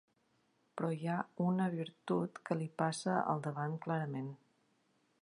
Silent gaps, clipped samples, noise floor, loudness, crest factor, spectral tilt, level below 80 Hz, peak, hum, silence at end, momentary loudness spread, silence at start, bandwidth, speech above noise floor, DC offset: none; under 0.1%; -76 dBFS; -38 LUFS; 20 dB; -6.5 dB/octave; -84 dBFS; -18 dBFS; none; 0.85 s; 8 LU; 0.75 s; 11 kHz; 39 dB; under 0.1%